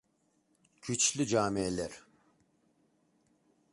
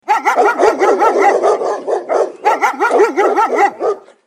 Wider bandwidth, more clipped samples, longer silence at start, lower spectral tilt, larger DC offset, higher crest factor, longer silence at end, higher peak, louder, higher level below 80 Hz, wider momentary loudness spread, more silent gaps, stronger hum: second, 11.5 kHz vs 14 kHz; neither; first, 0.85 s vs 0.05 s; about the same, -3.5 dB/octave vs -2.5 dB/octave; neither; first, 22 dB vs 14 dB; first, 1.75 s vs 0.3 s; second, -14 dBFS vs 0 dBFS; second, -31 LUFS vs -13 LUFS; about the same, -64 dBFS vs -64 dBFS; first, 13 LU vs 6 LU; neither; neither